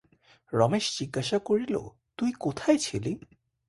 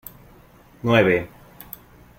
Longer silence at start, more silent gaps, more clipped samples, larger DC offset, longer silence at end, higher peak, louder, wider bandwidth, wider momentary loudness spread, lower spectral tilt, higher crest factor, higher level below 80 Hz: second, 0.5 s vs 0.85 s; neither; neither; neither; second, 0.5 s vs 0.9 s; second, -8 dBFS vs -2 dBFS; second, -28 LUFS vs -20 LUFS; second, 11.5 kHz vs 16.5 kHz; second, 9 LU vs 23 LU; second, -5 dB/octave vs -6.5 dB/octave; about the same, 20 dB vs 22 dB; second, -60 dBFS vs -52 dBFS